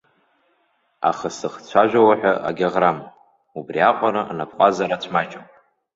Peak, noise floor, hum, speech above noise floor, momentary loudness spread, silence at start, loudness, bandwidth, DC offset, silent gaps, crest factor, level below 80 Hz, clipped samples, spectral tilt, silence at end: -2 dBFS; -65 dBFS; none; 46 dB; 15 LU; 1 s; -19 LUFS; 8 kHz; under 0.1%; none; 18 dB; -62 dBFS; under 0.1%; -5.5 dB/octave; 0.55 s